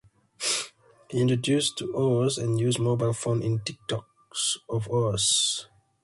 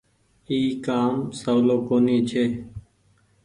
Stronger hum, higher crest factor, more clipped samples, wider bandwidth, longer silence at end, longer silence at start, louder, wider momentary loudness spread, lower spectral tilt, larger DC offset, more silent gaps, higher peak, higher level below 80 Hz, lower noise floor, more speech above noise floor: neither; about the same, 16 dB vs 14 dB; neither; about the same, 11.5 kHz vs 10.5 kHz; second, 0.4 s vs 0.65 s; about the same, 0.4 s vs 0.5 s; second, -26 LUFS vs -23 LUFS; about the same, 11 LU vs 11 LU; second, -4 dB/octave vs -6.5 dB/octave; neither; neither; second, -12 dBFS vs -8 dBFS; about the same, -58 dBFS vs -56 dBFS; second, -48 dBFS vs -62 dBFS; second, 22 dB vs 40 dB